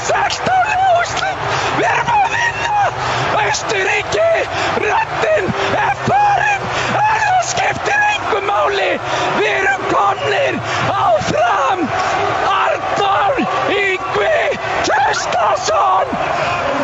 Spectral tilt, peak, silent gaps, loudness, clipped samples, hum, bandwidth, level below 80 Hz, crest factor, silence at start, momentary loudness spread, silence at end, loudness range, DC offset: -3.5 dB/octave; -2 dBFS; none; -15 LUFS; under 0.1%; none; 8.2 kHz; -44 dBFS; 14 dB; 0 s; 3 LU; 0 s; 1 LU; under 0.1%